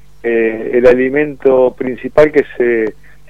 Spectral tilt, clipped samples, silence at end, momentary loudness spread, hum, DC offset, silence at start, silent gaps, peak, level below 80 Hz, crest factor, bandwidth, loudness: -7.5 dB/octave; 0.4%; 0.4 s; 7 LU; none; 2%; 0.25 s; none; 0 dBFS; -40 dBFS; 12 dB; 8 kHz; -13 LUFS